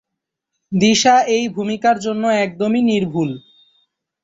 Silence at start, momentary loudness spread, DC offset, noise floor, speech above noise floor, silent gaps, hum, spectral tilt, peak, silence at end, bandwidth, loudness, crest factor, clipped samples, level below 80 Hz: 0.7 s; 10 LU; under 0.1%; -81 dBFS; 65 dB; none; none; -4.5 dB/octave; -2 dBFS; 0.85 s; 8 kHz; -16 LUFS; 16 dB; under 0.1%; -58 dBFS